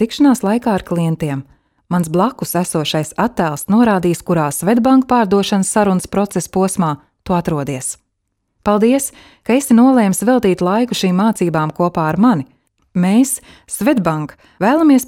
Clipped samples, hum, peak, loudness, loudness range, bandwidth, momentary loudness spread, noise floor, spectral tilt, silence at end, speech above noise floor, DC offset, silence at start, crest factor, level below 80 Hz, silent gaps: under 0.1%; none; 0 dBFS; -15 LUFS; 4 LU; 16.5 kHz; 11 LU; -70 dBFS; -5.5 dB/octave; 0 s; 56 dB; under 0.1%; 0 s; 14 dB; -48 dBFS; none